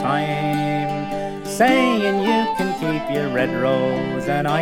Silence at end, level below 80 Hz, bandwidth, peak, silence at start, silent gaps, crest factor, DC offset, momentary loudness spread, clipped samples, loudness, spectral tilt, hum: 0 s; -48 dBFS; 17 kHz; -4 dBFS; 0 s; none; 16 dB; under 0.1%; 7 LU; under 0.1%; -20 LUFS; -5.5 dB/octave; none